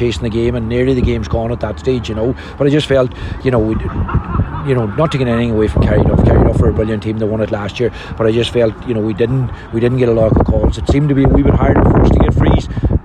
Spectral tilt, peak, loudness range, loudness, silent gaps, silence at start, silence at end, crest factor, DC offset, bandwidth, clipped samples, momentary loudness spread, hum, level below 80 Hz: -8 dB/octave; -2 dBFS; 4 LU; -14 LUFS; none; 0 s; 0 s; 10 dB; under 0.1%; 10.5 kHz; under 0.1%; 8 LU; none; -20 dBFS